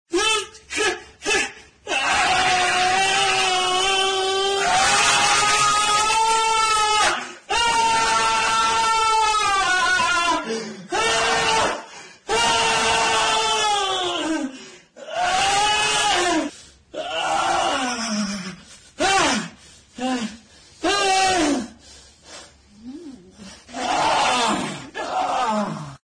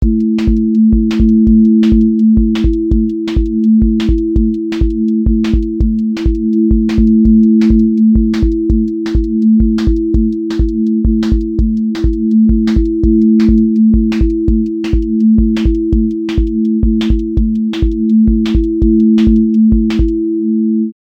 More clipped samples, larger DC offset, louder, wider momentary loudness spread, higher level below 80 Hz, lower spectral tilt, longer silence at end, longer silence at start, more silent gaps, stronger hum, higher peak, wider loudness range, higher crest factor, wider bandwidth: neither; neither; second, -19 LUFS vs -12 LUFS; first, 12 LU vs 6 LU; second, -48 dBFS vs -16 dBFS; second, -1 dB/octave vs -9 dB/octave; about the same, 0.1 s vs 0.15 s; about the same, 0.1 s vs 0 s; neither; neither; second, -6 dBFS vs 0 dBFS; first, 7 LU vs 3 LU; first, 16 dB vs 10 dB; first, 10 kHz vs 6.6 kHz